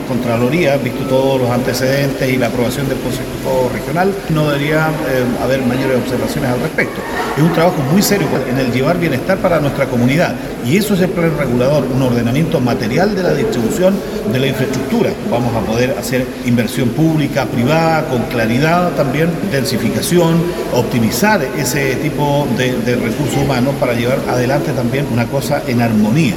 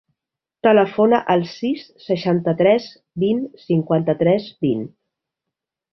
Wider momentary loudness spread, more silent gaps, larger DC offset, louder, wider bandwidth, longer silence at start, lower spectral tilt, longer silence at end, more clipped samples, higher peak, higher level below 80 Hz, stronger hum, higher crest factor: second, 4 LU vs 10 LU; neither; neither; first, -15 LUFS vs -19 LUFS; first, 17.5 kHz vs 6.2 kHz; second, 0 s vs 0.65 s; second, -6 dB/octave vs -8.5 dB/octave; second, 0 s vs 1.05 s; neither; about the same, 0 dBFS vs -2 dBFS; first, -36 dBFS vs -60 dBFS; neither; about the same, 14 dB vs 18 dB